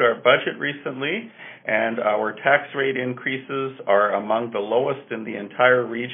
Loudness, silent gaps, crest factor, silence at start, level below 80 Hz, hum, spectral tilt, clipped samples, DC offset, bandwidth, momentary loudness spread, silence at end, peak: -22 LUFS; none; 22 dB; 0 s; -72 dBFS; none; 0 dB/octave; under 0.1%; under 0.1%; 3.8 kHz; 12 LU; 0 s; 0 dBFS